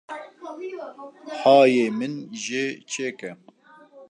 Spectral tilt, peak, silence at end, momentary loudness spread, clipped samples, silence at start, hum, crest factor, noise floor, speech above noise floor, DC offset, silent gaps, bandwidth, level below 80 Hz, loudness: -4 dB/octave; -4 dBFS; 0.05 s; 23 LU; under 0.1%; 0.1 s; none; 20 dB; -51 dBFS; 28 dB; under 0.1%; none; 10 kHz; -82 dBFS; -21 LUFS